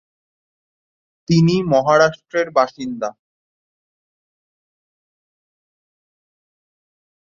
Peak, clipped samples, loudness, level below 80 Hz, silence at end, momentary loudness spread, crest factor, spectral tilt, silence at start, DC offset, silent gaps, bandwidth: -2 dBFS; under 0.1%; -17 LUFS; -58 dBFS; 4.25 s; 11 LU; 20 dB; -6.5 dB/octave; 1.3 s; under 0.1%; none; 7.4 kHz